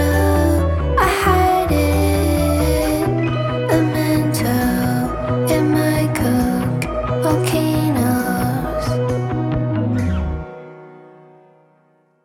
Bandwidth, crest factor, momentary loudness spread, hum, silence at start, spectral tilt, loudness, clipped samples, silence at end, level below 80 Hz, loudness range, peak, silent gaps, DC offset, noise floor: 17.5 kHz; 16 dB; 5 LU; none; 0 s; -6.5 dB/octave; -18 LUFS; under 0.1%; 1.2 s; -28 dBFS; 5 LU; -2 dBFS; none; under 0.1%; -57 dBFS